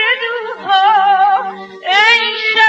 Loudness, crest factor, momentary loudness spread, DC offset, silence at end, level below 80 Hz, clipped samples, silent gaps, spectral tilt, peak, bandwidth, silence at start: -11 LUFS; 12 dB; 13 LU; under 0.1%; 0 s; -74 dBFS; under 0.1%; none; -0.5 dB/octave; 0 dBFS; 8.2 kHz; 0 s